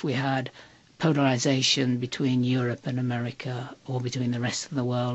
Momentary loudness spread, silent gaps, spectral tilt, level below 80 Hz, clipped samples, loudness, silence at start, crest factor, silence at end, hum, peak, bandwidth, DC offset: 11 LU; none; -5 dB/octave; -64 dBFS; under 0.1%; -27 LUFS; 0 s; 18 dB; 0 s; none; -8 dBFS; 8.2 kHz; under 0.1%